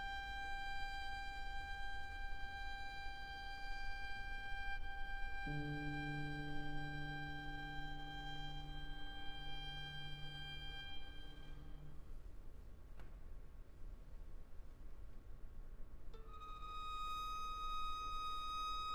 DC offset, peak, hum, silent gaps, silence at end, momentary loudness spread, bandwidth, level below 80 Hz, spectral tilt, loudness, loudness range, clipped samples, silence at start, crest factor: under 0.1%; -32 dBFS; none; none; 0 s; 16 LU; 13.5 kHz; -50 dBFS; -4.5 dB/octave; -48 LUFS; 14 LU; under 0.1%; 0 s; 14 dB